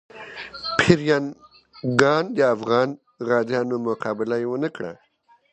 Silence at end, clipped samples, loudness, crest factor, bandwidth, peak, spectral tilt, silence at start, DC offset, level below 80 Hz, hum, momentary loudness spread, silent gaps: 0.6 s; under 0.1%; -22 LUFS; 22 dB; 9.8 kHz; 0 dBFS; -5.5 dB/octave; 0.15 s; under 0.1%; -54 dBFS; none; 16 LU; none